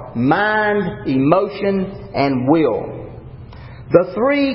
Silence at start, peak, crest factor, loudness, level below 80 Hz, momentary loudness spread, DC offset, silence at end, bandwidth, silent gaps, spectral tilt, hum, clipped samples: 0 s; 0 dBFS; 18 dB; -17 LUFS; -44 dBFS; 21 LU; under 0.1%; 0 s; 5.8 kHz; none; -12 dB/octave; none; under 0.1%